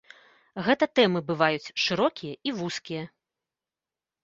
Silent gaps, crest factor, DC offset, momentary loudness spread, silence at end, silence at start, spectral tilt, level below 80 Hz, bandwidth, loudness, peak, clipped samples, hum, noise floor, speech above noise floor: none; 22 dB; under 0.1%; 14 LU; 1.15 s; 0.55 s; -5 dB/octave; -68 dBFS; 7.8 kHz; -26 LUFS; -6 dBFS; under 0.1%; none; under -90 dBFS; over 64 dB